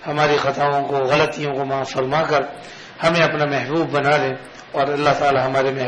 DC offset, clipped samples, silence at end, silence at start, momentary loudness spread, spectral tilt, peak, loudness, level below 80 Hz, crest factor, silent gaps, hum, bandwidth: under 0.1%; under 0.1%; 0 s; 0 s; 8 LU; -5.5 dB/octave; -2 dBFS; -19 LUFS; -54 dBFS; 16 dB; none; none; 10.5 kHz